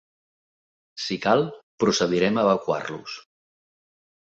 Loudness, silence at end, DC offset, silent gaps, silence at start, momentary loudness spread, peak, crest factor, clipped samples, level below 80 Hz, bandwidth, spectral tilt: -23 LUFS; 1.15 s; under 0.1%; 1.63-1.78 s; 0.95 s; 16 LU; -6 dBFS; 20 dB; under 0.1%; -62 dBFS; 8 kHz; -4.5 dB/octave